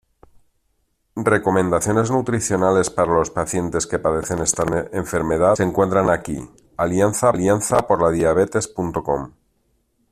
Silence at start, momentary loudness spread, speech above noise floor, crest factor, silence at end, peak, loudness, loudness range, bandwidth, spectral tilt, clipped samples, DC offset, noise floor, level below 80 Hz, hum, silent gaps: 1.15 s; 8 LU; 49 dB; 18 dB; 0.8 s; -2 dBFS; -19 LUFS; 2 LU; 14.5 kHz; -5.5 dB/octave; under 0.1%; under 0.1%; -67 dBFS; -46 dBFS; none; none